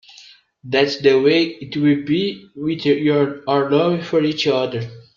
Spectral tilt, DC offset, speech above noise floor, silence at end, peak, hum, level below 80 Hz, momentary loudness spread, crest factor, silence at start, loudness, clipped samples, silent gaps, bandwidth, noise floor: -6.5 dB/octave; under 0.1%; 29 dB; 0.15 s; -2 dBFS; none; -60 dBFS; 9 LU; 16 dB; 0.65 s; -18 LUFS; under 0.1%; none; 7.4 kHz; -47 dBFS